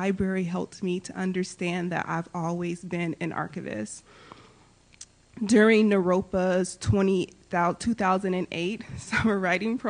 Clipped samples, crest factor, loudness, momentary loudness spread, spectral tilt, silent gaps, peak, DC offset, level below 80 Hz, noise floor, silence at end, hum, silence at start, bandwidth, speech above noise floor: under 0.1%; 18 dB; -26 LUFS; 12 LU; -6 dB/octave; none; -8 dBFS; under 0.1%; -52 dBFS; -57 dBFS; 0 s; none; 0 s; 10 kHz; 31 dB